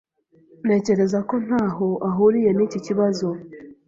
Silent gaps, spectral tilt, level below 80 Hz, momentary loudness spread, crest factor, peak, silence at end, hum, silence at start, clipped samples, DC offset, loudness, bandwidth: none; -7.5 dB/octave; -60 dBFS; 10 LU; 16 dB; -6 dBFS; 0.15 s; none; 0.65 s; under 0.1%; under 0.1%; -21 LUFS; 7.6 kHz